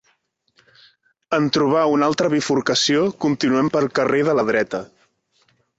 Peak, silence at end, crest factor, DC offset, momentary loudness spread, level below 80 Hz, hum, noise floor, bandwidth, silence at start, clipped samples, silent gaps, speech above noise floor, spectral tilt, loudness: -4 dBFS; 0.95 s; 18 dB; under 0.1%; 4 LU; -60 dBFS; none; -66 dBFS; 8 kHz; 1.3 s; under 0.1%; none; 47 dB; -4.5 dB/octave; -19 LUFS